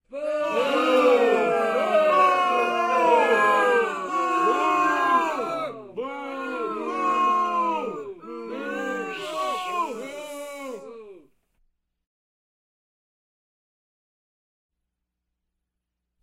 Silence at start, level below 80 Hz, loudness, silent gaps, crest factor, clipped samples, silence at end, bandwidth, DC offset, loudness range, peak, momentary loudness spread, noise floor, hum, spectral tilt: 0.1 s; -72 dBFS; -23 LUFS; none; 18 dB; under 0.1%; 5.05 s; 16 kHz; under 0.1%; 13 LU; -6 dBFS; 17 LU; -83 dBFS; none; -3.5 dB/octave